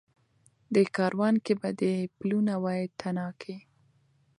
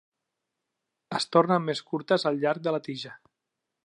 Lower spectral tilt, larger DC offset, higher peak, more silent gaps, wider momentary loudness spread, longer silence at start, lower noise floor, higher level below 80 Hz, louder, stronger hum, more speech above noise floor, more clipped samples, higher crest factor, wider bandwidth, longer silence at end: first, -7.5 dB/octave vs -5.5 dB/octave; neither; second, -12 dBFS vs -8 dBFS; neither; about the same, 12 LU vs 14 LU; second, 0.7 s vs 1.1 s; second, -67 dBFS vs -85 dBFS; first, -74 dBFS vs -80 dBFS; about the same, -29 LUFS vs -27 LUFS; neither; second, 39 dB vs 58 dB; neither; about the same, 18 dB vs 22 dB; about the same, 11 kHz vs 11.5 kHz; about the same, 0.8 s vs 0.7 s